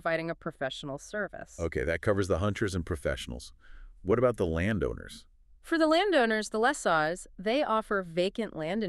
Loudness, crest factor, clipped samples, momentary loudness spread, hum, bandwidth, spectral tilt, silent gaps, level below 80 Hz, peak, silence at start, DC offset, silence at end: -30 LUFS; 18 dB; under 0.1%; 13 LU; none; 13 kHz; -5.5 dB/octave; none; -48 dBFS; -12 dBFS; 0.05 s; under 0.1%; 0 s